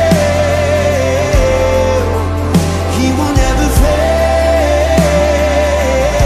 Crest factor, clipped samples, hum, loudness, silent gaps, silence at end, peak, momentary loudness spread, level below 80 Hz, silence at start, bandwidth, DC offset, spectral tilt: 10 dB; under 0.1%; none; -12 LUFS; none; 0 s; 0 dBFS; 3 LU; -18 dBFS; 0 s; 15.5 kHz; under 0.1%; -5.5 dB/octave